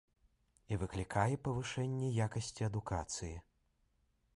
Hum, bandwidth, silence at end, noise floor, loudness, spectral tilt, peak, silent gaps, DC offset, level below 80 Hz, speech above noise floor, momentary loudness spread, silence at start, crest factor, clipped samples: none; 11.5 kHz; 0.95 s; -77 dBFS; -39 LUFS; -5.5 dB/octave; -18 dBFS; none; under 0.1%; -56 dBFS; 39 dB; 8 LU; 0.7 s; 22 dB; under 0.1%